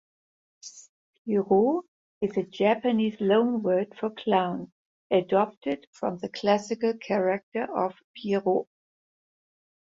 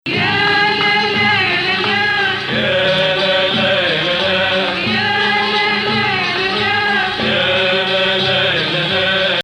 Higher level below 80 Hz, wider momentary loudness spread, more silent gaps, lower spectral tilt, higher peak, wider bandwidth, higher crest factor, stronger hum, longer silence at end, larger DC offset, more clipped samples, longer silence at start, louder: second, -70 dBFS vs -48 dBFS; first, 14 LU vs 3 LU; first, 0.89-1.25 s, 1.88-2.21 s, 4.72-5.10 s, 5.57-5.61 s, 5.87-5.93 s, 7.43-7.52 s, 8.04-8.14 s vs none; first, -6.5 dB/octave vs -4.5 dB/octave; second, -10 dBFS vs -2 dBFS; second, 7.8 kHz vs 12.5 kHz; first, 18 dB vs 12 dB; neither; first, 1.3 s vs 0 s; neither; neither; first, 0.65 s vs 0.05 s; second, -27 LUFS vs -14 LUFS